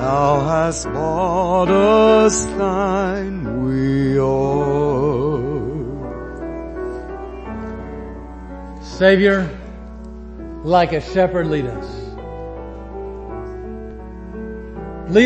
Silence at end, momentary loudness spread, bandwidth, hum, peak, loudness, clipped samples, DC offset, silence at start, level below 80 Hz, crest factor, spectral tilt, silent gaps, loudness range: 0 s; 19 LU; 8.8 kHz; none; 0 dBFS; -18 LUFS; under 0.1%; under 0.1%; 0 s; -36 dBFS; 18 dB; -5.5 dB/octave; none; 12 LU